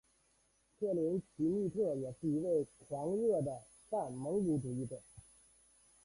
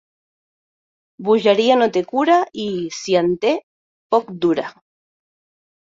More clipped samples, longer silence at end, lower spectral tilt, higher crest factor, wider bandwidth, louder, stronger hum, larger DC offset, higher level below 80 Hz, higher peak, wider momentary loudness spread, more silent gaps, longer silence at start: neither; second, 0.85 s vs 1.15 s; first, -9 dB/octave vs -5 dB/octave; about the same, 14 dB vs 18 dB; first, 11.5 kHz vs 7.8 kHz; second, -37 LUFS vs -18 LUFS; neither; neither; second, -70 dBFS vs -64 dBFS; second, -24 dBFS vs -2 dBFS; about the same, 8 LU vs 10 LU; second, none vs 3.63-4.10 s; second, 0.8 s vs 1.2 s